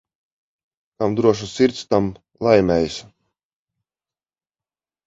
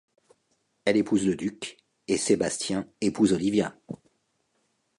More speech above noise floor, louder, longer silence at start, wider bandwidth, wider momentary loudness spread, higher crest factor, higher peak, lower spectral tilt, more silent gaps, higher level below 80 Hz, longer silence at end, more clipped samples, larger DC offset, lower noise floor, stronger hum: first, over 72 dB vs 48 dB; first, -19 LUFS vs -26 LUFS; first, 1 s vs 0.85 s; second, 7.8 kHz vs 11.5 kHz; second, 10 LU vs 18 LU; about the same, 20 dB vs 20 dB; first, -2 dBFS vs -8 dBFS; first, -6 dB/octave vs -4.5 dB/octave; neither; first, -48 dBFS vs -60 dBFS; first, 2.05 s vs 1.05 s; neither; neither; first, under -90 dBFS vs -73 dBFS; neither